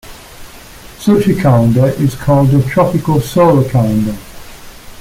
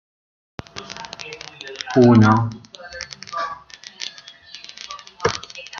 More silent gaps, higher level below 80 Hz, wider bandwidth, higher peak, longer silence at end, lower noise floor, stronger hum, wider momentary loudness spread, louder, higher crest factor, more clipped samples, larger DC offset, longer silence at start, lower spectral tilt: neither; first, -36 dBFS vs -54 dBFS; first, 16.5 kHz vs 7.2 kHz; about the same, -2 dBFS vs -2 dBFS; about the same, 0 s vs 0 s; second, -34 dBFS vs -42 dBFS; neither; second, 6 LU vs 24 LU; first, -12 LUFS vs -19 LUFS; second, 12 dB vs 20 dB; neither; neither; second, 0.05 s vs 0.75 s; first, -8 dB/octave vs -6.5 dB/octave